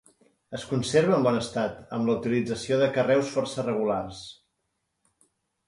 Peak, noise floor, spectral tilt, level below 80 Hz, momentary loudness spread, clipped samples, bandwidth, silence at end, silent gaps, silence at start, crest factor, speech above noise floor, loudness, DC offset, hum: -8 dBFS; -78 dBFS; -5.5 dB/octave; -60 dBFS; 16 LU; under 0.1%; 11.5 kHz; 1.35 s; none; 0.5 s; 18 dB; 53 dB; -26 LUFS; under 0.1%; none